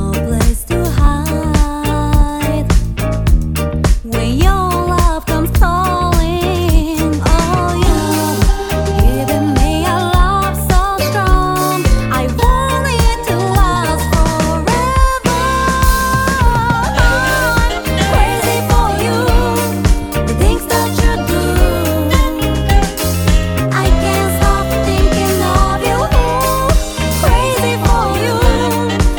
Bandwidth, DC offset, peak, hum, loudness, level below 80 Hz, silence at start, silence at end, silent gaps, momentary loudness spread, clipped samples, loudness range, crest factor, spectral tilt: 19.5 kHz; under 0.1%; 0 dBFS; none; -14 LUFS; -16 dBFS; 0 s; 0 s; none; 3 LU; under 0.1%; 2 LU; 12 dB; -5 dB/octave